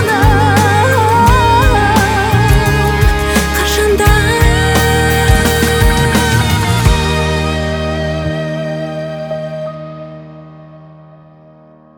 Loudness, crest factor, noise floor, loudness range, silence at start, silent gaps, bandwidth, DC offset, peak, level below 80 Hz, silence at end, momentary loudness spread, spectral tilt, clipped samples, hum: -12 LUFS; 12 dB; -41 dBFS; 11 LU; 0 s; none; 19.5 kHz; under 0.1%; 0 dBFS; -20 dBFS; 1.1 s; 12 LU; -5 dB/octave; under 0.1%; none